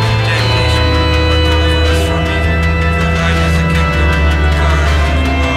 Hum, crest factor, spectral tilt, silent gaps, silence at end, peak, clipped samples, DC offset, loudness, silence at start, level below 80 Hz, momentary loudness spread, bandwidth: none; 8 dB; -5.5 dB/octave; none; 0 s; -2 dBFS; under 0.1%; under 0.1%; -12 LUFS; 0 s; -16 dBFS; 2 LU; 12.5 kHz